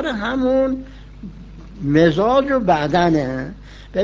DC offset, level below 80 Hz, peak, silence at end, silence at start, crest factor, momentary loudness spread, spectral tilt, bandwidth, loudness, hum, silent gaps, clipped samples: under 0.1%; -38 dBFS; -2 dBFS; 0 s; 0 s; 18 dB; 22 LU; -7 dB/octave; 7.6 kHz; -18 LUFS; 50 Hz at -35 dBFS; none; under 0.1%